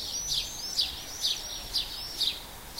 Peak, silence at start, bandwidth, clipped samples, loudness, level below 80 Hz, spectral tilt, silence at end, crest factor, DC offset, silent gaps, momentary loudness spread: -14 dBFS; 0 s; 16 kHz; under 0.1%; -30 LUFS; -50 dBFS; 0 dB/octave; 0 s; 20 dB; under 0.1%; none; 4 LU